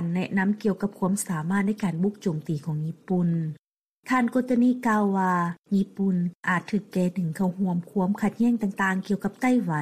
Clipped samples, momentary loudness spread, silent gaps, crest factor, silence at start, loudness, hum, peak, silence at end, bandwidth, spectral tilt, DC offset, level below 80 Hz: under 0.1%; 6 LU; 3.58-4.01 s, 5.58-5.62 s, 6.35-6.40 s; 14 dB; 0 s; -26 LUFS; none; -12 dBFS; 0 s; 14.5 kHz; -7 dB/octave; under 0.1%; -64 dBFS